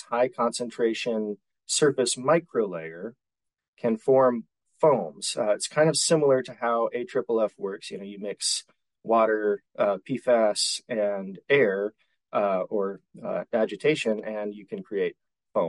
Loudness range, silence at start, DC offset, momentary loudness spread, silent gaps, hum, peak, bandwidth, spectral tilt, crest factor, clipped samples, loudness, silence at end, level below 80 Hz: 3 LU; 0.1 s; under 0.1%; 13 LU; 3.68-3.73 s; none; -10 dBFS; 11.5 kHz; -3.5 dB/octave; 16 dB; under 0.1%; -26 LUFS; 0 s; -76 dBFS